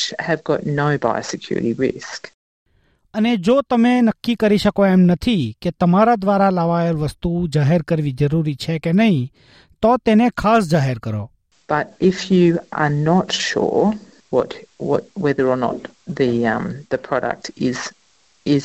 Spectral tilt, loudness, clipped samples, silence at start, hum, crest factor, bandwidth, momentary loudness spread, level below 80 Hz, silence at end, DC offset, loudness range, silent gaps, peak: -6.5 dB/octave; -18 LUFS; under 0.1%; 0 s; none; 14 dB; 10.5 kHz; 11 LU; -46 dBFS; 0 s; under 0.1%; 5 LU; 2.34-2.66 s; -4 dBFS